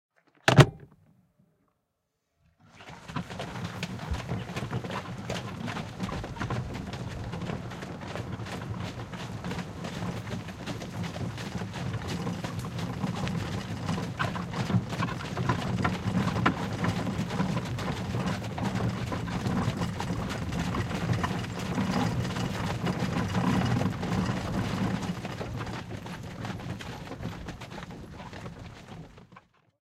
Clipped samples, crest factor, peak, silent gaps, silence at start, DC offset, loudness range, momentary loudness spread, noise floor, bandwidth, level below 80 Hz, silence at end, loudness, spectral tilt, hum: under 0.1%; 28 dB; -2 dBFS; none; 0.45 s; under 0.1%; 9 LU; 11 LU; -80 dBFS; 16 kHz; -48 dBFS; 0.6 s; -32 LUFS; -6 dB/octave; none